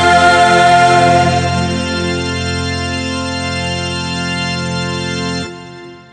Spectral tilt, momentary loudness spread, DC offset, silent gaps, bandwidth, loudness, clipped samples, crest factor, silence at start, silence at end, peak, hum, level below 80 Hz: -4.5 dB/octave; 11 LU; under 0.1%; none; 10 kHz; -13 LUFS; under 0.1%; 14 dB; 0 s; 0.1 s; 0 dBFS; none; -36 dBFS